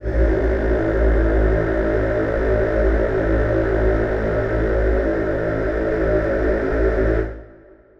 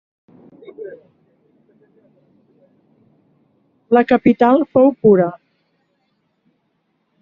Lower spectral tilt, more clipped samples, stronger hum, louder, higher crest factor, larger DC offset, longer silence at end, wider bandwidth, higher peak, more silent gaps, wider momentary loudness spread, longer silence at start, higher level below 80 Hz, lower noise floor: first, -9.5 dB/octave vs -6.5 dB/octave; neither; neither; second, -20 LUFS vs -14 LUFS; second, 12 dB vs 18 dB; neither; second, 0.45 s vs 1.85 s; about the same, 5.8 kHz vs 5.4 kHz; second, -6 dBFS vs -2 dBFS; neither; second, 3 LU vs 23 LU; second, 0 s vs 0.8 s; first, -22 dBFS vs -60 dBFS; second, -46 dBFS vs -67 dBFS